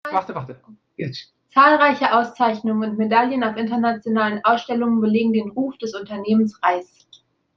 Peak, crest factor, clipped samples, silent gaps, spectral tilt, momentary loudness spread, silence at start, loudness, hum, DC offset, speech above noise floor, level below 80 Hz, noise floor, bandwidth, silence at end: -2 dBFS; 18 dB; under 0.1%; none; -6.5 dB/octave; 15 LU; 0.05 s; -19 LUFS; none; under 0.1%; 34 dB; -66 dBFS; -54 dBFS; 6.6 kHz; 0.75 s